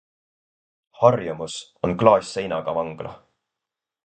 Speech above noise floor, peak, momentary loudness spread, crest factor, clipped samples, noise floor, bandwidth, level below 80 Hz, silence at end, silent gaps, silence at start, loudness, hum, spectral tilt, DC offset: 65 dB; 0 dBFS; 15 LU; 24 dB; under 0.1%; -86 dBFS; 9.2 kHz; -56 dBFS; 0.9 s; none; 1 s; -22 LUFS; none; -6 dB/octave; under 0.1%